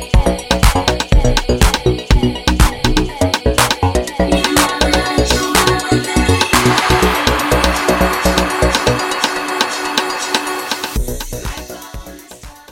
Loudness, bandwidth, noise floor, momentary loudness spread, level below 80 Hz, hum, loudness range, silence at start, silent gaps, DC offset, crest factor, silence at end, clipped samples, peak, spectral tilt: -14 LUFS; 17 kHz; -36 dBFS; 10 LU; -20 dBFS; none; 5 LU; 0 s; none; under 0.1%; 14 dB; 0.2 s; under 0.1%; 0 dBFS; -4 dB/octave